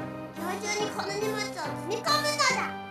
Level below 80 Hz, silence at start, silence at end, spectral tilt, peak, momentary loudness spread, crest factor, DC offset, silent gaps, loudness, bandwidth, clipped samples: -66 dBFS; 0 s; 0 s; -2.5 dB/octave; -12 dBFS; 10 LU; 18 dB; under 0.1%; none; -29 LUFS; 15 kHz; under 0.1%